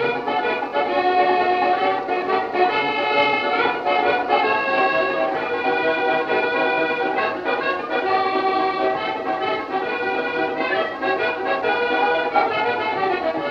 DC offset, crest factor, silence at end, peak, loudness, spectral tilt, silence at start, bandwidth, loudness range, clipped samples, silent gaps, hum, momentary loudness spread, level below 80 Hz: under 0.1%; 16 dB; 0 s; -4 dBFS; -20 LUFS; -5.5 dB/octave; 0 s; 7 kHz; 3 LU; under 0.1%; none; none; 4 LU; -58 dBFS